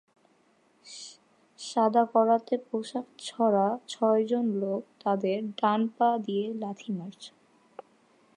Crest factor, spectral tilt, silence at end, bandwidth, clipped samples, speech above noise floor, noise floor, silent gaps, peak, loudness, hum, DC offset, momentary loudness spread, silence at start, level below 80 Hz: 18 dB; -6 dB/octave; 0.55 s; 10.5 kHz; under 0.1%; 38 dB; -66 dBFS; none; -10 dBFS; -28 LUFS; none; under 0.1%; 19 LU; 0.85 s; -86 dBFS